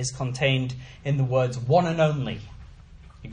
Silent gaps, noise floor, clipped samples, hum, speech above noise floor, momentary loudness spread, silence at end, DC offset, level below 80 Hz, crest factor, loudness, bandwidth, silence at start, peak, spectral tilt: none; -47 dBFS; under 0.1%; none; 23 dB; 14 LU; 0 s; under 0.1%; -48 dBFS; 18 dB; -24 LUFS; 9.8 kHz; 0 s; -6 dBFS; -6 dB/octave